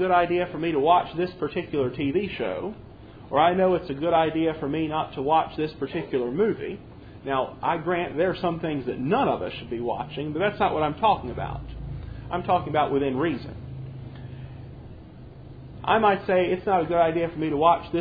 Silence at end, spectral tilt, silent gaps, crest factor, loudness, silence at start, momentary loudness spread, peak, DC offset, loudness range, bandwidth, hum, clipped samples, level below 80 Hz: 0 s; -9.5 dB/octave; none; 18 dB; -25 LUFS; 0 s; 18 LU; -6 dBFS; under 0.1%; 4 LU; 5 kHz; none; under 0.1%; -48 dBFS